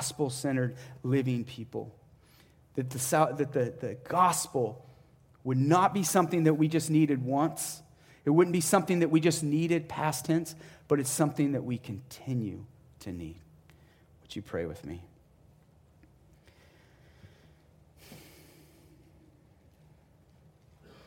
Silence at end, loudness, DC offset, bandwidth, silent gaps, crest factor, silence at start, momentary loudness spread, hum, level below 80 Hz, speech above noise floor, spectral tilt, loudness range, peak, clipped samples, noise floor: 2.85 s; -29 LUFS; under 0.1%; 17 kHz; none; 22 dB; 0 s; 18 LU; none; -64 dBFS; 32 dB; -5.5 dB/octave; 17 LU; -10 dBFS; under 0.1%; -61 dBFS